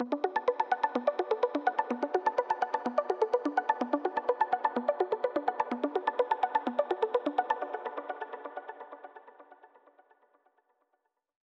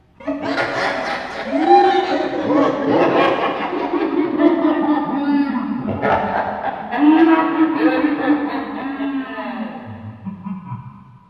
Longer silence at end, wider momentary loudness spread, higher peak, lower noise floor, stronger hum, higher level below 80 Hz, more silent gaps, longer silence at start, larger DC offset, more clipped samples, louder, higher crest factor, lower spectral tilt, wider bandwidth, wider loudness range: first, 1.75 s vs 0.25 s; second, 11 LU vs 16 LU; second, -12 dBFS vs 0 dBFS; first, -79 dBFS vs -38 dBFS; neither; second, -86 dBFS vs -54 dBFS; neither; second, 0 s vs 0.2 s; neither; neither; second, -31 LUFS vs -18 LUFS; about the same, 20 dB vs 18 dB; second, -5 dB/octave vs -6.5 dB/octave; about the same, 7.8 kHz vs 7.6 kHz; first, 12 LU vs 4 LU